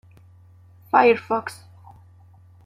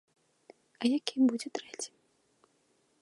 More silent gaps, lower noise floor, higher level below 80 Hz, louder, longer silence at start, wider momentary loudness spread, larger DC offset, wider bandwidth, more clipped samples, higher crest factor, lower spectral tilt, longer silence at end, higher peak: neither; second, -50 dBFS vs -72 dBFS; first, -68 dBFS vs -88 dBFS; first, -20 LUFS vs -32 LUFS; first, 0.95 s vs 0.8 s; first, 21 LU vs 14 LU; neither; first, 14 kHz vs 11.5 kHz; neither; about the same, 22 dB vs 22 dB; first, -5.5 dB/octave vs -3 dB/octave; about the same, 1.1 s vs 1.15 s; first, -2 dBFS vs -12 dBFS